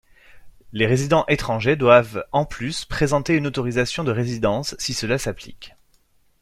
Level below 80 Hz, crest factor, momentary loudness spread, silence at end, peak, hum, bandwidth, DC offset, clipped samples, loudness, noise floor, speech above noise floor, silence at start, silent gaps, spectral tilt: -42 dBFS; 20 dB; 11 LU; 0.75 s; -2 dBFS; none; 15 kHz; under 0.1%; under 0.1%; -21 LUFS; -60 dBFS; 39 dB; 0.35 s; none; -5 dB/octave